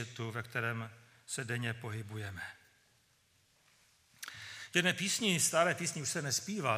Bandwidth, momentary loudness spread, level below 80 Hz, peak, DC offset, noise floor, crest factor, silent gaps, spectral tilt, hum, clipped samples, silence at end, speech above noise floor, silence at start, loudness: 15.5 kHz; 17 LU; -76 dBFS; -14 dBFS; under 0.1%; -71 dBFS; 24 dB; none; -3 dB/octave; none; under 0.1%; 0 s; 36 dB; 0 s; -34 LUFS